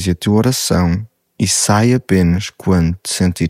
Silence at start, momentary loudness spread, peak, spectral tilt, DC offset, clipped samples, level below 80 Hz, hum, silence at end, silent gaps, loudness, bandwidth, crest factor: 0 s; 6 LU; -2 dBFS; -5 dB/octave; under 0.1%; under 0.1%; -34 dBFS; none; 0 s; none; -15 LUFS; 16 kHz; 14 dB